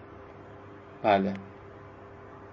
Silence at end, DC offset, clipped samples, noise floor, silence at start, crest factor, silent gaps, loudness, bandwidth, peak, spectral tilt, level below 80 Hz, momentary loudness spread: 0 s; under 0.1%; under 0.1%; -47 dBFS; 0 s; 24 dB; none; -28 LUFS; 6.4 kHz; -10 dBFS; -8 dB/octave; -60 dBFS; 23 LU